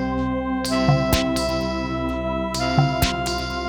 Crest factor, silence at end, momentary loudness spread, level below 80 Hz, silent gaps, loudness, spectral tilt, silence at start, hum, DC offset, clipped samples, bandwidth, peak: 18 dB; 0 s; 6 LU; -34 dBFS; none; -22 LUFS; -5.5 dB/octave; 0 s; none; under 0.1%; under 0.1%; over 20 kHz; -4 dBFS